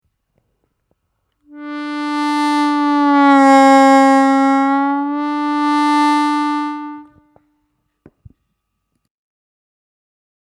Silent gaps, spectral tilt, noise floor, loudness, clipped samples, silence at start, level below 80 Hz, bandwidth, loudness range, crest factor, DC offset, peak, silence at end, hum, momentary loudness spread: none; -3 dB/octave; -72 dBFS; -13 LUFS; under 0.1%; 1.55 s; -64 dBFS; 11.5 kHz; 9 LU; 16 dB; under 0.1%; 0 dBFS; 3.4 s; none; 16 LU